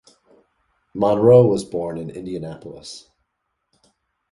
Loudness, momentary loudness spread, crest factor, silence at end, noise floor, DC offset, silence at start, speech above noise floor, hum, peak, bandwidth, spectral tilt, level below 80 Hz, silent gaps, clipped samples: -18 LUFS; 24 LU; 20 dB; 1.35 s; -76 dBFS; under 0.1%; 0.95 s; 57 dB; none; -2 dBFS; 11.5 kHz; -8 dB/octave; -54 dBFS; none; under 0.1%